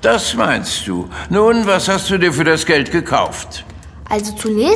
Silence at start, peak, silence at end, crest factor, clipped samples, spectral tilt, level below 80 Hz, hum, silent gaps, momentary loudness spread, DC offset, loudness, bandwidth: 0 s; 0 dBFS; 0 s; 16 dB; under 0.1%; -4 dB/octave; -38 dBFS; none; none; 13 LU; under 0.1%; -15 LUFS; 11 kHz